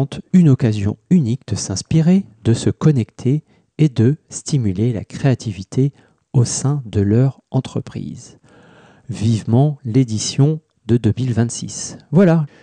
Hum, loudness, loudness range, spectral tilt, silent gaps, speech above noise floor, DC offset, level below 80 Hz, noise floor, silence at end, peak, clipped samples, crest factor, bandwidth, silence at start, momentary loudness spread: none; -18 LUFS; 3 LU; -6.5 dB/octave; none; 30 dB; under 0.1%; -50 dBFS; -47 dBFS; 0.15 s; -4 dBFS; under 0.1%; 14 dB; 10 kHz; 0 s; 10 LU